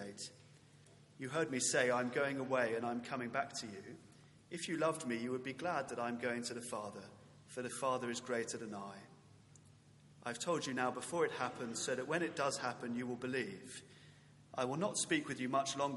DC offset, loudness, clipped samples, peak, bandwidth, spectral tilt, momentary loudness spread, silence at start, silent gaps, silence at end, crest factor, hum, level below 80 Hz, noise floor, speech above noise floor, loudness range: under 0.1%; -39 LUFS; under 0.1%; -18 dBFS; 11.5 kHz; -3.5 dB/octave; 14 LU; 0 s; none; 0 s; 22 dB; none; -82 dBFS; -64 dBFS; 24 dB; 5 LU